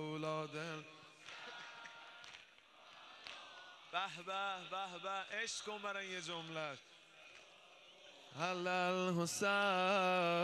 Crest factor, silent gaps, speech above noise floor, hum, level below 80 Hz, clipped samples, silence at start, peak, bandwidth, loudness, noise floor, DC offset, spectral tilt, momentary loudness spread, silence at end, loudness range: 20 dB; none; 24 dB; none; -88 dBFS; under 0.1%; 0 s; -22 dBFS; 13.5 kHz; -40 LUFS; -63 dBFS; under 0.1%; -3.5 dB/octave; 24 LU; 0 s; 11 LU